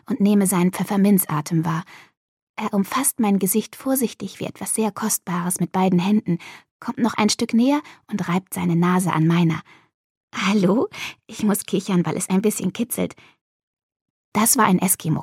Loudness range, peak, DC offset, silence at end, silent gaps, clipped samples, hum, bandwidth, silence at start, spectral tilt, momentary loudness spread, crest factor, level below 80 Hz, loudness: 2 LU; -4 dBFS; under 0.1%; 0 s; 2.17-2.54 s, 6.71-6.80 s, 9.94-10.28 s, 13.41-13.77 s, 13.83-13.89 s, 13.96-14.32 s; under 0.1%; none; 17 kHz; 0.1 s; -5 dB/octave; 12 LU; 18 dB; -64 dBFS; -21 LUFS